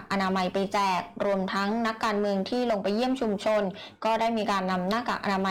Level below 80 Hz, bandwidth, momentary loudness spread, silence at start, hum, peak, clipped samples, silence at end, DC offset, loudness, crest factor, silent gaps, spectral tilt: -60 dBFS; 17 kHz; 2 LU; 0 s; none; -20 dBFS; under 0.1%; 0 s; under 0.1%; -27 LUFS; 6 dB; none; -5.5 dB/octave